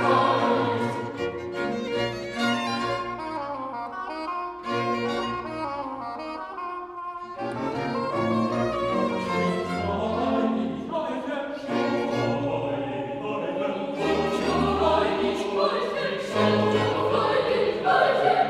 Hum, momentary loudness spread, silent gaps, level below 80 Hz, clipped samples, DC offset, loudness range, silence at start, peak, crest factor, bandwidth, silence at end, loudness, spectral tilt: none; 10 LU; none; -52 dBFS; under 0.1%; under 0.1%; 7 LU; 0 s; -8 dBFS; 18 dB; 13 kHz; 0 s; -26 LUFS; -6 dB/octave